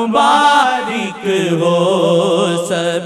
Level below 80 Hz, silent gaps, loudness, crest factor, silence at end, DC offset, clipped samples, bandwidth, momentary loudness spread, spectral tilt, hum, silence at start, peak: -62 dBFS; none; -13 LUFS; 12 dB; 0 s; 0.1%; under 0.1%; 13.5 kHz; 8 LU; -4.5 dB/octave; none; 0 s; 0 dBFS